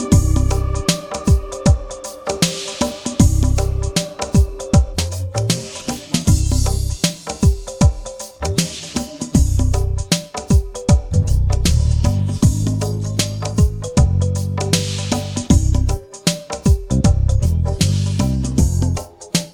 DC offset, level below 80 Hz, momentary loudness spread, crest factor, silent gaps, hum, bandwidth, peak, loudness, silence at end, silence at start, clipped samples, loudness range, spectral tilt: under 0.1%; -22 dBFS; 6 LU; 16 dB; none; none; 18.5 kHz; -2 dBFS; -18 LUFS; 0.05 s; 0 s; under 0.1%; 2 LU; -5.5 dB/octave